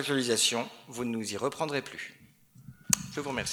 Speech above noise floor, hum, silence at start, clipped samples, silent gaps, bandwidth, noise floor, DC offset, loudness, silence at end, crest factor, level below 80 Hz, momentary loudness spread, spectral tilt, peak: 25 dB; none; 0 s; under 0.1%; none; over 20 kHz; -57 dBFS; under 0.1%; -30 LUFS; 0 s; 32 dB; -62 dBFS; 15 LU; -2.5 dB/octave; -2 dBFS